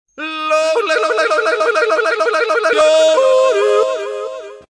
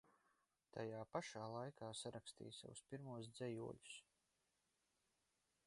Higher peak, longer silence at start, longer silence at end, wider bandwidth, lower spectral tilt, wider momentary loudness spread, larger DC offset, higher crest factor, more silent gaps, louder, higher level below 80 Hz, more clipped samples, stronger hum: first, -2 dBFS vs -32 dBFS; first, 0.2 s vs 0.05 s; second, 0.1 s vs 1.65 s; about the same, 11 kHz vs 11.5 kHz; second, -0.5 dB/octave vs -4.5 dB/octave; first, 12 LU vs 8 LU; neither; second, 12 dB vs 24 dB; neither; first, -14 LUFS vs -53 LUFS; first, -64 dBFS vs -84 dBFS; neither; neither